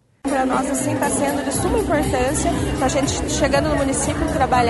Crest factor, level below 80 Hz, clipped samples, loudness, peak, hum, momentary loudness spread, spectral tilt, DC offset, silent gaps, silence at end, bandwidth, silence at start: 14 dB; -32 dBFS; under 0.1%; -20 LUFS; -4 dBFS; none; 3 LU; -4.5 dB/octave; under 0.1%; none; 0 s; 12 kHz; 0.25 s